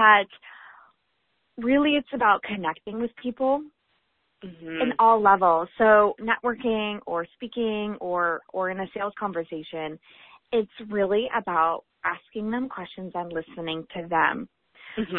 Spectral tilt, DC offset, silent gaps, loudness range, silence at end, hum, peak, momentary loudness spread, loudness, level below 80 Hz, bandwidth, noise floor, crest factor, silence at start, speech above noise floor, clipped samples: -9 dB/octave; under 0.1%; none; 7 LU; 0 s; none; -4 dBFS; 16 LU; -25 LUFS; -60 dBFS; 4.2 kHz; -73 dBFS; 22 dB; 0 s; 49 dB; under 0.1%